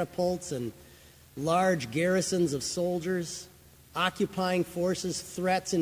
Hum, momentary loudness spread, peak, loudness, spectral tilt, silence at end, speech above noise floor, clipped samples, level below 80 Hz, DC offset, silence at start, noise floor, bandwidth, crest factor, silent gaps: none; 12 LU; -10 dBFS; -30 LUFS; -4.5 dB/octave; 0 s; 25 dB; under 0.1%; -58 dBFS; under 0.1%; 0 s; -54 dBFS; 16 kHz; 18 dB; none